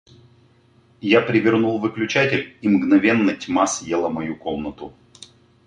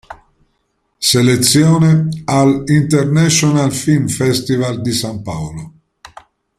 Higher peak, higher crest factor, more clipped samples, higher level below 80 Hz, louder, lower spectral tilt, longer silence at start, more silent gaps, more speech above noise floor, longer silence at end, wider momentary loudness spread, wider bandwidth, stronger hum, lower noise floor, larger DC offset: about the same, -2 dBFS vs 0 dBFS; about the same, 18 dB vs 14 dB; neither; second, -56 dBFS vs -46 dBFS; second, -19 LUFS vs -13 LUFS; about the same, -5 dB/octave vs -5 dB/octave; first, 1.05 s vs 0.1 s; neither; second, 36 dB vs 52 dB; second, 0.75 s vs 0.9 s; about the same, 13 LU vs 13 LU; second, 10.5 kHz vs 15.5 kHz; neither; second, -55 dBFS vs -65 dBFS; neither